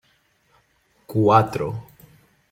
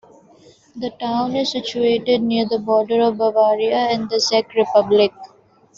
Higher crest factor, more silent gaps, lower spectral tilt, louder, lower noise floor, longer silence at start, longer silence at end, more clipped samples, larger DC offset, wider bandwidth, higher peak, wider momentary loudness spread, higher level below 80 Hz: first, 22 dB vs 16 dB; neither; first, -8 dB/octave vs -4.5 dB/octave; about the same, -20 LUFS vs -18 LUFS; first, -63 dBFS vs -52 dBFS; first, 1.1 s vs 0.75 s; first, 0.7 s vs 0.5 s; neither; neither; first, 16.5 kHz vs 7.6 kHz; about the same, -2 dBFS vs -2 dBFS; first, 14 LU vs 6 LU; first, -56 dBFS vs -62 dBFS